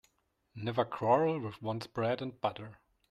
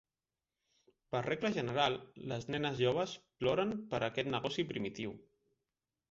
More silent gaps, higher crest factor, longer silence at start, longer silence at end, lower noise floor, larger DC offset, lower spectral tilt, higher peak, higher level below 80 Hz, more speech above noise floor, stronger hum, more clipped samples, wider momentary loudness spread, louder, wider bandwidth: neither; about the same, 20 dB vs 22 dB; second, 0.55 s vs 1.1 s; second, 0.35 s vs 0.9 s; second, -76 dBFS vs under -90 dBFS; neither; first, -7.5 dB/octave vs -4 dB/octave; about the same, -14 dBFS vs -16 dBFS; about the same, -70 dBFS vs -68 dBFS; second, 43 dB vs over 54 dB; neither; neither; first, 17 LU vs 10 LU; about the same, -34 LUFS vs -36 LUFS; first, 12.5 kHz vs 7.6 kHz